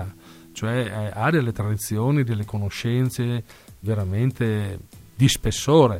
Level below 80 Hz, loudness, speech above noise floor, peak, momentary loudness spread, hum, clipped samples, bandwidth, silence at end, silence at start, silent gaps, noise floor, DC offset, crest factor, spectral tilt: -44 dBFS; -23 LUFS; 21 dB; -4 dBFS; 13 LU; none; under 0.1%; 16.5 kHz; 0 s; 0 s; none; -42 dBFS; under 0.1%; 18 dB; -6 dB/octave